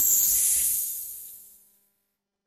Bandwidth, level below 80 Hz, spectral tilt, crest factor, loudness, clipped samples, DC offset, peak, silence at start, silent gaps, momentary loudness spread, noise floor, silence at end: 16.5 kHz; -60 dBFS; 2 dB/octave; 18 dB; -21 LUFS; under 0.1%; under 0.1%; -10 dBFS; 0 s; none; 20 LU; -80 dBFS; 1.05 s